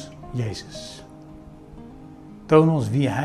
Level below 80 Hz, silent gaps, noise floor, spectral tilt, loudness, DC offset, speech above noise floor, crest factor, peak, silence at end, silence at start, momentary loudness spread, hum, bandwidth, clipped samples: -50 dBFS; none; -43 dBFS; -7.5 dB/octave; -21 LUFS; under 0.1%; 22 dB; 22 dB; -2 dBFS; 0 s; 0 s; 27 LU; none; 12 kHz; under 0.1%